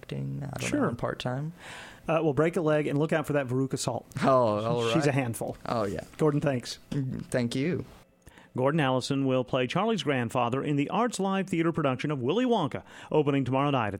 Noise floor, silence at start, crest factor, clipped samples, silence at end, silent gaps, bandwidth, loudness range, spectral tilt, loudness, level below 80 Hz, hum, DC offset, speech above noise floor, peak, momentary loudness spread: -55 dBFS; 0.1 s; 16 dB; under 0.1%; 0 s; none; 16.5 kHz; 3 LU; -6 dB/octave; -28 LUFS; -58 dBFS; none; under 0.1%; 27 dB; -12 dBFS; 9 LU